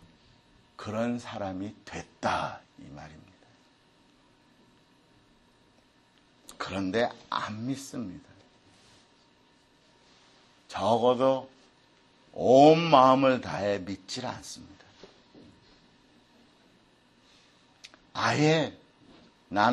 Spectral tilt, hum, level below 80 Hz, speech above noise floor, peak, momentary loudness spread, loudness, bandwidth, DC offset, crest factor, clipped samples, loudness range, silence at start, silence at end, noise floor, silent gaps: -5.5 dB/octave; none; -66 dBFS; 37 dB; -6 dBFS; 24 LU; -26 LUFS; 12 kHz; under 0.1%; 24 dB; under 0.1%; 18 LU; 0.8 s; 0 s; -63 dBFS; none